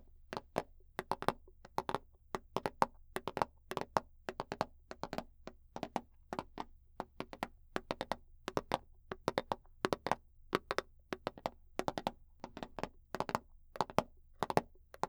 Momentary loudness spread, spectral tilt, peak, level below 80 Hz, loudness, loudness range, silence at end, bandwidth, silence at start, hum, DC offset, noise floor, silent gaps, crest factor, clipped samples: 13 LU; -5 dB/octave; -10 dBFS; -60 dBFS; -42 LUFS; 5 LU; 0 s; over 20 kHz; 0.15 s; none; under 0.1%; -56 dBFS; none; 32 dB; under 0.1%